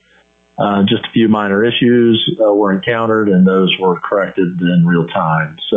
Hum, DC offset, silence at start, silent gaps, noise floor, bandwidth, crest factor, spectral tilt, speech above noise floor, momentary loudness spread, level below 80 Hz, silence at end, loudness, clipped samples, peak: none; under 0.1%; 0.6 s; none; -52 dBFS; 3.9 kHz; 10 dB; -9 dB/octave; 40 dB; 5 LU; -54 dBFS; 0 s; -13 LUFS; under 0.1%; -2 dBFS